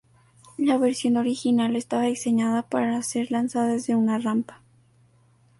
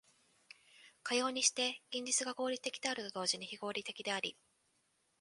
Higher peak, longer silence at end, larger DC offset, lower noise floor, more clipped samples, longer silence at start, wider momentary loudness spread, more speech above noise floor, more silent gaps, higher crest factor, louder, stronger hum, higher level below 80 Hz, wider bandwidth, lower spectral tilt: first, -10 dBFS vs -16 dBFS; first, 1.05 s vs 0.9 s; neither; second, -59 dBFS vs -78 dBFS; neither; second, 0.6 s vs 0.8 s; second, 4 LU vs 10 LU; second, 36 dB vs 40 dB; neither; second, 14 dB vs 24 dB; first, -24 LUFS vs -36 LUFS; neither; first, -68 dBFS vs -86 dBFS; about the same, 11.5 kHz vs 11.5 kHz; first, -5 dB/octave vs -0.5 dB/octave